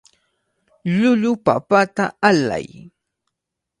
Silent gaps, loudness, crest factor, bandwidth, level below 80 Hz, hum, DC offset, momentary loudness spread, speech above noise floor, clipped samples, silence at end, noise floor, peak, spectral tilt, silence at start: none; -18 LUFS; 20 dB; 11 kHz; -58 dBFS; none; under 0.1%; 11 LU; 64 dB; under 0.1%; 1.15 s; -82 dBFS; 0 dBFS; -6 dB/octave; 0.85 s